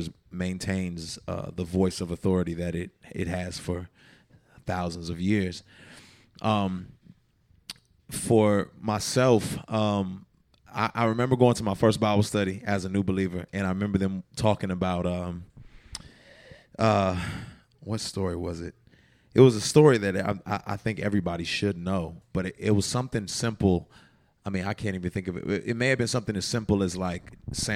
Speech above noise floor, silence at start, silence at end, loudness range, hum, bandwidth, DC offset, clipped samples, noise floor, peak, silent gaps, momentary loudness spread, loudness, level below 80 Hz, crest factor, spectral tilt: 37 dB; 0 s; 0 s; 7 LU; none; 15.5 kHz; under 0.1%; under 0.1%; -63 dBFS; -4 dBFS; none; 16 LU; -27 LUFS; -54 dBFS; 24 dB; -5.5 dB/octave